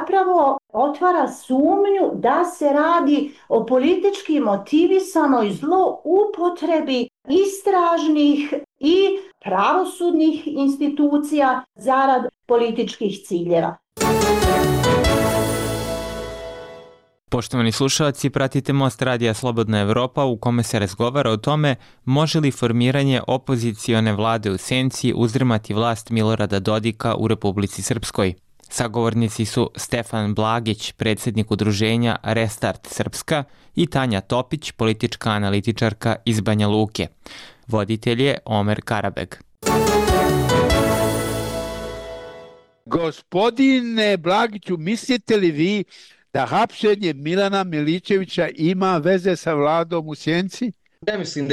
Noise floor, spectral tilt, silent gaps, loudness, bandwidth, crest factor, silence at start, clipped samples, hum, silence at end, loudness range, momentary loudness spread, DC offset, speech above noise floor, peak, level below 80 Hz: -49 dBFS; -5.5 dB/octave; none; -20 LUFS; 16 kHz; 12 dB; 0 s; under 0.1%; none; 0 s; 4 LU; 8 LU; under 0.1%; 30 dB; -8 dBFS; -40 dBFS